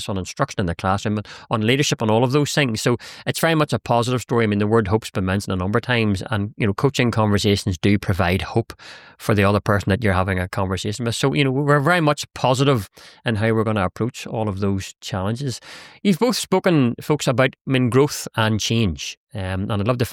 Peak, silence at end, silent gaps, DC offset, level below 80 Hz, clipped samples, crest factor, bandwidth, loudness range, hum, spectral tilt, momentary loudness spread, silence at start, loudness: -4 dBFS; 0 s; 17.61-17.65 s, 19.17-19.27 s; under 0.1%; -46 dBFS; under 0.1%; 16 dB; 17 kHz; 3 LU; none; -5.5 dB/octave; 9 LU; 0 s; -20 LUFS